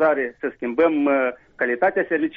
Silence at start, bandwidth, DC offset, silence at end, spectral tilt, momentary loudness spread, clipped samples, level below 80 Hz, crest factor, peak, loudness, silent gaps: 0 s; 4.7 kHz; under 0.1%; 0 s; -4 dB/octave; 8 LU; under 0.1%; -62 dBFS; 14 dB; -6 dBFS; -21 LUFS; none